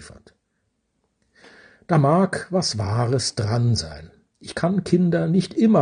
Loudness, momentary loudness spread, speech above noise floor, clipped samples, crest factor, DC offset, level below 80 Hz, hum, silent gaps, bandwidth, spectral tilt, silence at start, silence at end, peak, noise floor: -21 LUFS; 10 LU; 52 dB; under 0.1%; 18 dB; under 0.1%; -54 dBFS; none; none; 10 kHz; -6 dB/octave; 0 s; 0 s; -4 dBFS; -72 dBFS